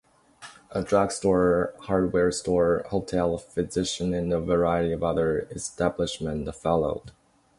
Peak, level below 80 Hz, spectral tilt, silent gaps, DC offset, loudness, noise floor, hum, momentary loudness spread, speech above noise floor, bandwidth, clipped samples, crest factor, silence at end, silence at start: -8 dBFS; -46 dBFS; -5.5 dB/octave; none; under 0.1%; -26 LUFS; -49 dBFS; none; 8 LU; 24 dB; 11.5 kHz; under 0.1%; 18 dB; 0.5 s; 0.4 s